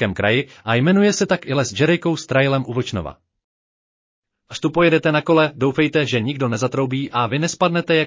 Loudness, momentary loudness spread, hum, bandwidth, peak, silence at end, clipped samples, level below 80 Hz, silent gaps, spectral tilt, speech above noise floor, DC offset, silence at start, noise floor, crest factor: -18 LUFS; 7 LU; none; 7.6 kHz; -4 dBFS; 0 s; under 0.1%; -50 dBFS; 3.44-4.23 s; -5.5 dB/octave; over 72 dB; under 0.1%; 0 s; under -90 dBFS; 14 dB